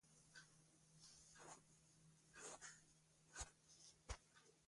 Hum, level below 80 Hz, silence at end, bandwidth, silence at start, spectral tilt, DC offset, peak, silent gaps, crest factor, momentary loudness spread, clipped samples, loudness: none; -70 dBFS; 0 s; 11.5 kHz; 0.05 s; -2 dB/octave; under 0.1%; -36 dBFS; none; 28 dB; 10 LU; under 0.1%; -61 LUFS